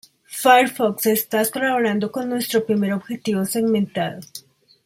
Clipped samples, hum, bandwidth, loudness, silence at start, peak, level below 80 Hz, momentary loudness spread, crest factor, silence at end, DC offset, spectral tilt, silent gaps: under 0.1%; none; 16.5 kHz; -20 LUFS; 0.3 s; -2 dBFS; -66 dBFS; 12 LU; 18 dB; 0.45 s; under 0.1%; -4.5 dB/octave; none